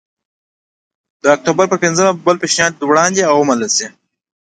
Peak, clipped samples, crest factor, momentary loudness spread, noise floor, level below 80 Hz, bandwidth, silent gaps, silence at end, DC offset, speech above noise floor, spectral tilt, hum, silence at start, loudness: 0 dBFS; under 0.1%; 16 dB; 4 LU; under -90 dBFS; -58 dBFS; 9.4 kHz; none; 0.6 s; under 0.1%; over 77 dB; -3 dB/octave; none; 1.25 s; -13 LUFS